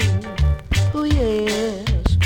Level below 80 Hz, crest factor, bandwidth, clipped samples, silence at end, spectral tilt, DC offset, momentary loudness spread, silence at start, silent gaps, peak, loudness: -24 dBFS; 12 dB; 16.5 kHz; under 0.1%; 0 s; -6 dB/octave; under 0.1%; 3 LU; 0 s; none; -6 dBFS; -20 LUFS